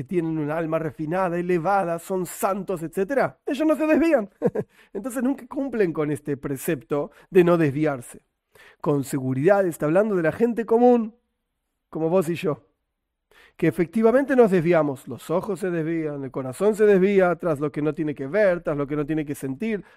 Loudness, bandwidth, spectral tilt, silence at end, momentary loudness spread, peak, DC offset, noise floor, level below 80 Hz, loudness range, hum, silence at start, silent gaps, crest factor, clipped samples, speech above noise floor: -23 LUFS; 16 kHz; -7 dB/octave; 0.15 s; 11 LU; -4 dBFS; under 0.1%; -79 dBFS; -58 dBFS; 3 LU; none; 0 s; none; 18 dB; under 0.1%; 56 dB